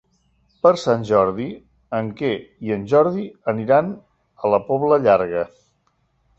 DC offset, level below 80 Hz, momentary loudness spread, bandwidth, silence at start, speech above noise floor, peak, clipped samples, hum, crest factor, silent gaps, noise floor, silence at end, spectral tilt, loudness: under 0.1%; -56 dBFS; 13 LU; 8 kHz; 0.65 s; 47 dB; -2 dBFS; under 0.1%; none; 18 dB; none; -66 dBFS; 0.9 s; -7 dB/octave; -20 LUFS